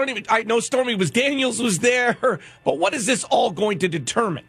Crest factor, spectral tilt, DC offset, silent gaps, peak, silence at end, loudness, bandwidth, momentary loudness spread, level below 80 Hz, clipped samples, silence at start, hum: 16 dB; -3.5 dB/octave; under 0.1%; none; -6 dBFS; 0.1 s; -20 LUFS; 14.5 kHz; 4 LU; -62 dBFS; under 0.1%; 0 s; none